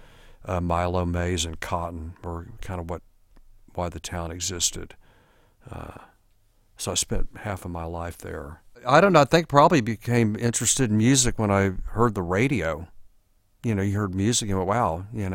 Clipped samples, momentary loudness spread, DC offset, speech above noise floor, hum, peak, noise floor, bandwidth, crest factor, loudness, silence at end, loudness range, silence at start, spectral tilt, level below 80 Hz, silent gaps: under 0.1%; 18 LU; under 0.1%; 37 dB; none; -2 dBFS; -61 dBFS; 16.5 kHz; 22 dB; -24 LUFS; 0 s; 12 LU; 0.4 s; -4.5 dB/octave; -42 dBFS; none